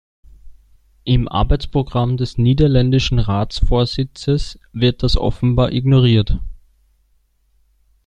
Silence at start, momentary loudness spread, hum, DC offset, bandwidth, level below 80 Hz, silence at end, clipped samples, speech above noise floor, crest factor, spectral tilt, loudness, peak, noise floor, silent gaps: 0.45 s; 8 LU; none; under 0.1%; 8.8 kHz; -26 dBFS; 1.55 s; under 0.1%; 44 dB; 14 dB; -7.5 dB/octave; -17 LUFS; -2 dBFS; -60 dBFS; none